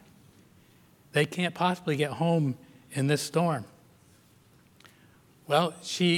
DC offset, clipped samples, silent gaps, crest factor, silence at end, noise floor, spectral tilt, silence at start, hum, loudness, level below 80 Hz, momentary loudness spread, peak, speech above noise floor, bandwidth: under 0.1%; under 0.1%; none; 20 dB; 0 s; -60 dBFS; -5.5 dB/octave; 1.15 s; none; -28 LUFS; -74 dBFS; 8 LU; -10 dBFS; 33 dB; 16.5 kHz